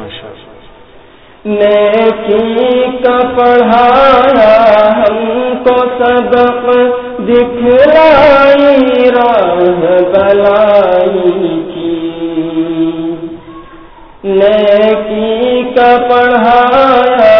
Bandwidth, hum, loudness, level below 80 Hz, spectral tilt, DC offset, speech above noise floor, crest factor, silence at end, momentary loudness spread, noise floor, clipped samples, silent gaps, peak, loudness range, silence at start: 5.4 kHz; none; -8 LUFS; -38 dBFS; -7.5 dB/octave; under 0.1%; 31 dB; 8 dB; 0 s; 11 LU; -38 dBFS; 2%; none; 0 dBFS; 6 LU; 0 s